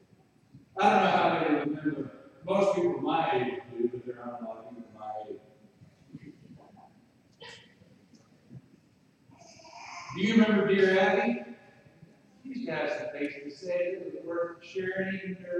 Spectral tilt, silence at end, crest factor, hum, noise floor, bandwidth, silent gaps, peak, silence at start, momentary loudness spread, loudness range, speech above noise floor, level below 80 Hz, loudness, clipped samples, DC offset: -6 dB/octave; 0 s; 20 dB; none; -64 dBFS; 9.6 kHz; none; -10 dBFS; 0.55 s; 24 LU; 19 LU; 35 dB; -74 dBFS; -29 LUFS; under 0.1%; under 0.1%